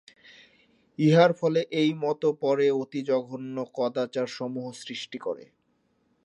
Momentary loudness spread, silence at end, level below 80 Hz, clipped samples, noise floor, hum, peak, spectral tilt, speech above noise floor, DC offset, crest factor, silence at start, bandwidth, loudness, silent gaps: 15 LU; 0.8 s; -78 dBFS; under 0.1%; -70 dBFS; none; -6 dBFS; -6.5 dB/octave; 45 dB; under 0.1%; 22 dB; 1 s; 10.5 kHz; -26 LUFS; none